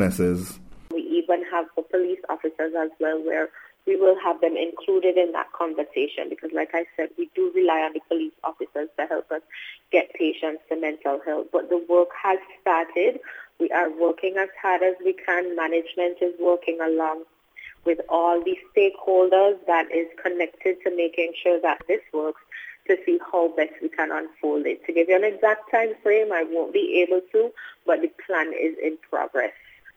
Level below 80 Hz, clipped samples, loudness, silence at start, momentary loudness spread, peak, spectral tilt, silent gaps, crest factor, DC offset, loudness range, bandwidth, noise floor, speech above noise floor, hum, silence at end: -62 dBFS; under 0.1%; -24 LUFS; 0 s; 9 LU; -4 dBFS; -6 dB/octave; none; 18 dB; under 0.1%; 4 LU; 15 kHz; -46 dBFS; 23 dB; none; 0.45 s